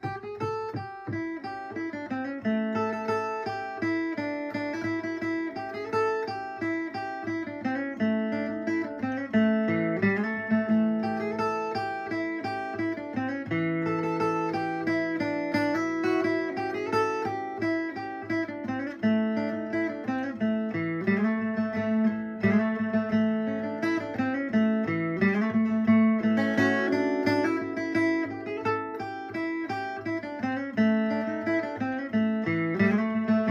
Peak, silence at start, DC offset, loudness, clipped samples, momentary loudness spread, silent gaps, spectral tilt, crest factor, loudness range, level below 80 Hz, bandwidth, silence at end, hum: -10 dBFS; 0 s; under 0.1%; -28 LUFS; under 0.1%; 8 LU; none; -7.5 dB/octave; 16 dB; 6 LU; -64 dBFS; 7 kHz; 0 s; none